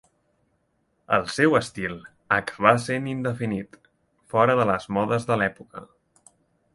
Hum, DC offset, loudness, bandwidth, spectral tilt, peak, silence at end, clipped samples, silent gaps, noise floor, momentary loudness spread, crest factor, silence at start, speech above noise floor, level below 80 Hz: none; under 0.1%; -23 LUFS; 11.5 kHz; -6 dB/octave; 0 dBFS; 0.9 s; under 0.1%; none; -70 dBFS; 16 LU; 24 dB; 1.1 s; 47 dB; -58 dBFS